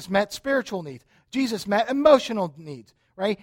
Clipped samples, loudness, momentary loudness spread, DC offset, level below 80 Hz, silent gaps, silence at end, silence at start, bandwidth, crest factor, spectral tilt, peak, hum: under 0.1%; -23 LUFS; 23 LU; under 0.1%; -60 dBFS; none; 0.1 s; 0 s; 16.5 kHz; 20 dB; -5 dB/octave; -4 dBFS; none